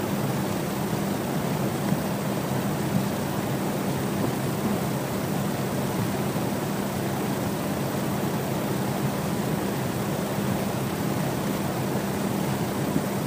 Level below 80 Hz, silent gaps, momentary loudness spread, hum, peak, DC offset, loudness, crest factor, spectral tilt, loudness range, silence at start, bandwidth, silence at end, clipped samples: -52 dBFS; none; 1 LU; none; -10 dBFS; under 0.1%; -27 LUFS; 16 dB; -5.5 dB/octave; 0 LU; 0 s; 15.5 kHz; 0 s; under 0.1%